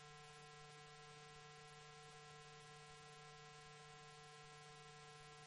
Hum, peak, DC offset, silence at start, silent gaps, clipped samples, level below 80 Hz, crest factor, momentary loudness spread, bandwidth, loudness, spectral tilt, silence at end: none; -44 dBFS; under 0.1%; 0 s; none; under 0.1%; -80 dBFS; 16 dB; 0 LU; 11 kHz; -60 LUFS; -3 dB/octave; 0 s